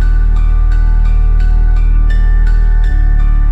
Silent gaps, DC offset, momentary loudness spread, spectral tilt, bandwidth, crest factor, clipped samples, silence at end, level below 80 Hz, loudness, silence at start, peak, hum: none; 2%; 1 LU; -8 dB/octave; 3.7 kHz; 4 dB; under 0.1%; 0 s; -8 dBFS; -14 LUFS; 0 s; -4 dBFS; none